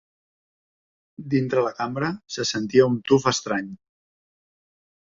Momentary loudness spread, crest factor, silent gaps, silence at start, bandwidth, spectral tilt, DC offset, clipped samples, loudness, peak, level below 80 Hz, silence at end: 9 LU; 22 dB; none; 1.2 s; 7.8 kHz; -5 dB/octave; under 0.1%; under 0.1%; -23 LUFS; -4 dBFS; -62 dBFS; 1.4 s